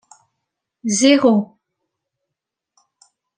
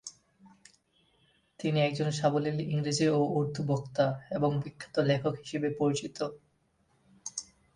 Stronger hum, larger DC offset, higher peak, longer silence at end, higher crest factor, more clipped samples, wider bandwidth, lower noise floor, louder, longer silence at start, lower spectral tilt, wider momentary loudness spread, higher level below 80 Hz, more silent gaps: neither; neither; first, -2 dBFS vs -12 dBFS; first, 1.9 s vs 0.35 s; about the same, 20 dB vs 18 dB; neither; about the same, 10 kHz vs 10.5 kHz; first, -83 dBFS vs -71 dBFS; first, -15 LUFS vs -31 LUFS; first, 0.85 s vs 0.05 s; second, -3.5 dB/octave vs -6 dB/octave; first, 17 LU vs 11 LU; about the same, -70 dBFS vs -66 dBFS; neither